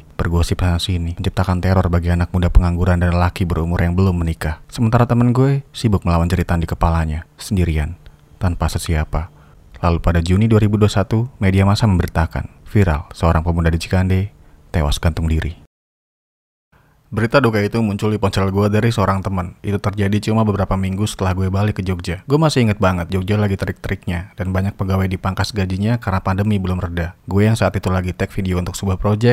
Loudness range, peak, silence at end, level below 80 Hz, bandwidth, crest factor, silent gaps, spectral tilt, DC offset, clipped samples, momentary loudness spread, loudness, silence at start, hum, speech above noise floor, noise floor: 4 LU; 0 dBFS; 0 s; -30 dBFS; 15 kHz; 16 dB; 15.67-16.71 s; -7 dB/octave; under 0.1%; under 0.1%; 8 LU; -18 LUFS; 0.2 s; none; over 74 dB; under -90 dBFS